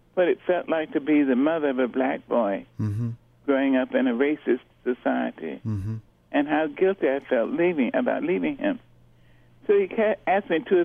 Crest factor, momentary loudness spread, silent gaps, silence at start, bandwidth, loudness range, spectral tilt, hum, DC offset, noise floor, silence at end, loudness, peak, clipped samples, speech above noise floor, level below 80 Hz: 16 dB; 9 LU; none; 0.15 s; 3.8 kHz; 2 LU; -9 dB/octave; none; under 0.1%; -55 dBFS; 0 s; -25 LUFS; -8 dBFS; under 0.1%; 31 dB; -60 dBFS